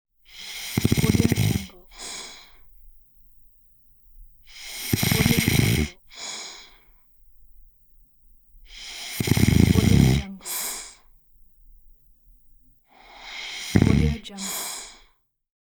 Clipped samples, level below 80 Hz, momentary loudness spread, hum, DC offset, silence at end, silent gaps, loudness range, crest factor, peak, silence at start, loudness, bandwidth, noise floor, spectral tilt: under 0.1%; -38 dBFS; 22 LU; none; under 0.1%; 0.7 s; none; 13 LU; 24 dB; -2 dBFS; 0.35 s; -23 LUFS; over 20 kHz; -61 dBFS; -5 dB/octave